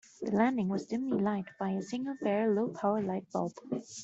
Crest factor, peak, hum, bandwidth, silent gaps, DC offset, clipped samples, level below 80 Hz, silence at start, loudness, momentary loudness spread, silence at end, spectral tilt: 18 dB; -14 dBFS; none; 8 kHz; none; under 0.1%; under 0.1%; -72 dBFS; 0.2 s; -33 LUFS; 7 LU; 0 s; -7 dB/octave